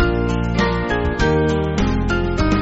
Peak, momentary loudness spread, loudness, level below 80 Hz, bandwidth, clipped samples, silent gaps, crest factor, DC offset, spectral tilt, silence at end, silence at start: -2 dBFS; 3 LU; -19 LUFS; -24 dBFS; 8 kHz; under 0.1%; none; 14 dB; under 0.1%; -5.5 dB/octave; 0 s; 0 s